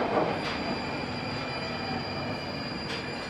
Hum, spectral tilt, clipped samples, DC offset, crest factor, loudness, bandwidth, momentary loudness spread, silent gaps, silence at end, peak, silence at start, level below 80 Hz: none; -5.5 dB/octave; under 0.1%; under 0.1%; 18 dB; -32 LUFS; 14.5 kHz; 5 LU; none; 0 s; -14 dBFS; 0 s; -54 dBFS